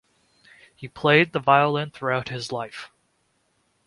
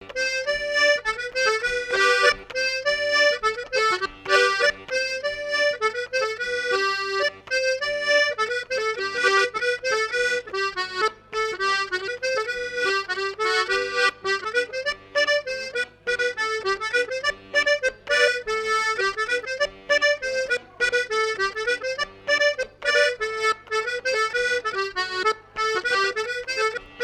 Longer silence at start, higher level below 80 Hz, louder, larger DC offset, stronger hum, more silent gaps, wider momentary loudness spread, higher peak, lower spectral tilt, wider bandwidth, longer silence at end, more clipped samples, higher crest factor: first, 0.8 s vs 0 s; second, -64 dBFS vs -56 dBFS; about the same, -22 LUFS vs -23 LUFS; neither; second, none vs 50 Hz at -60 dBFS; neither; first, 22 LU vs 7 LU; first, -2 dBFS vs -6 dBFS; first, -5.5 dB/octave vs -0.5 dB/octave; second, 11.5 kHz vs 15.5 kHz; first, 1 s vs 0 s; neither; about the same, 22 dB vs 18 dB